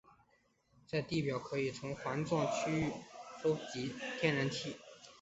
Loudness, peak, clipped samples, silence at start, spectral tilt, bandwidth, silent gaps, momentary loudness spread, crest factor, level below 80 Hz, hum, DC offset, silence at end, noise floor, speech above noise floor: -37 LUFS; -16 dBFS; under 0.1%; 0.9 s; -4.5 dB/octave; 8 kHz; none; 11 LU; 22 dB; -68 dBFS; none; under 0.1%; 0.05 s; -74 dBFS; 37 dB